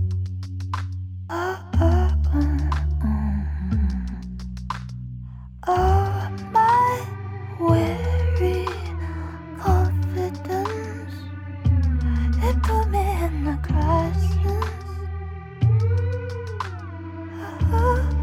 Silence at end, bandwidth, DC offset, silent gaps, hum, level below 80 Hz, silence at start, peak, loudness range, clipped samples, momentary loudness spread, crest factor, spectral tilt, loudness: 0 s; 14 kHz; under 0.1%; none; none; -26 dBFS; 0 s; -4 dBFS; 4 LU; under 0.1%; 14 LU; 18 dB; -8 dB/octave; -23 LUFS